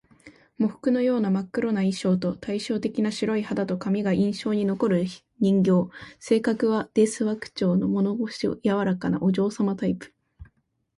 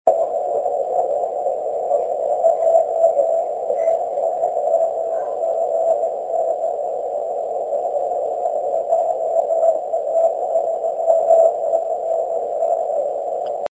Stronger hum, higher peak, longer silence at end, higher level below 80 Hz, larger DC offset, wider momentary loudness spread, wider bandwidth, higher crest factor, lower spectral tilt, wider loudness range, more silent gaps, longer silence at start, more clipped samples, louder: neither; second, -8 dBFS vs 0 dBFS; first, 0.55 s vs 0.05 s; first, -60 dBFS vs -68 dBFS; neither; about the same, 6 LU vs 7 LU; first, 11.5 kHz vs 8 kHz; about the same, 16 dB vs 18 dB; first, -7 dB/octave vs -5 dB/octave; about the same, 2 LU vs 3 LU; neither; first, 0.25 s vs 0.05 s; neither; second, -25 LUFS vs -19 LUFS